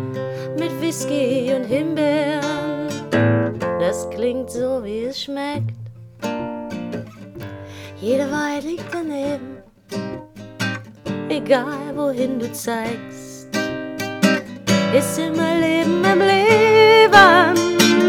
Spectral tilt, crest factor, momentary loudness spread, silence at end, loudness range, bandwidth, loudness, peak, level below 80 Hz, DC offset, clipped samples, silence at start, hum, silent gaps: -4.5 dB/octave; 18 dB; 18 LU; 0 s; 12 LU; 18 kHz; -18 LUFS; 0 dBFS; -54 dBFS; under 0.1%; under 0.1%; 0 s; none; none